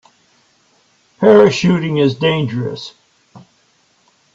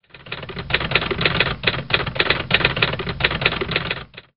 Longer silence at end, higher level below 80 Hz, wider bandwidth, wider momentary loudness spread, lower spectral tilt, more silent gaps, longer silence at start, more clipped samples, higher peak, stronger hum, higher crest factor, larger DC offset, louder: first, 0.95 s vs 0.1 s; second, -56 dBFS vs -38 dBFS; first, 7.8 kHz vs 5.6 kHz; first, 16 LU vs 12 LU; first, -6.5 dB/octave vs -1.5 dB/octave; neither; first, 1.2 s vs 0.15 s; neither; about the same, 0 dBFS vs 0 dBFS; neither; second, 16 dB vs 22 dB; second, under 0.1% vs 0.5%; first, -13 LUFS vs -20 LUFS